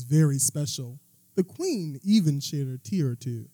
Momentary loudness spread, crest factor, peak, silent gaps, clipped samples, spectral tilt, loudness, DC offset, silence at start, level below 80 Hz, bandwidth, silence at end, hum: 10 LU; 16 dB; -10 dBFS; none; under 0.1%; -5.5 dB/octave; -27 LUFS; under 0.1%; 0 s; -82 dBFS; 18.5 kHz; 0.05 s; none